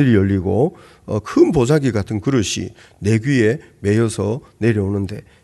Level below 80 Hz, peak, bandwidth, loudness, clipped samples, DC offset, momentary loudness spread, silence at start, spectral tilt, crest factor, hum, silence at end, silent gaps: -46 dBFS; -2 dBFS; 12 kHz; -18 LUFS; under 0.1%; under 0.1%; 10 LU; 0 s; -6.5 dB/octave; 16 dB; none; 0.25 s; none